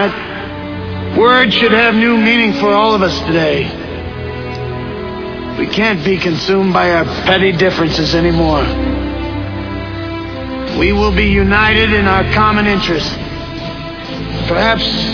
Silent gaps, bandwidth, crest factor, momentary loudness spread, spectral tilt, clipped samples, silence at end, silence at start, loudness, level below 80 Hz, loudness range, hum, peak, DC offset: none; 5.4 kHz; 14 dB; 14 LU; -6 dB/octave; under 0.1%; 0 s; 0 s; -13 LUFS; -26 dBFS; 5 LU; none; 0 dBFS; 0.4%